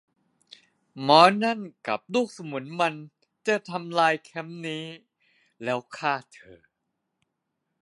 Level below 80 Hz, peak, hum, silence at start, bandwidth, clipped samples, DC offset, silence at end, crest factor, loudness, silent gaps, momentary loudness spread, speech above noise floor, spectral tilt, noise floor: -76 dBFS; -2 dBFS; none; 0.95 s; 11.5 kHz; under 0.1%; under 0.1%; 1.3 s; 26 dB; -25 LUFS; none; 18 LU; 55 dB; -4.5 dB/octave; -80 dBFS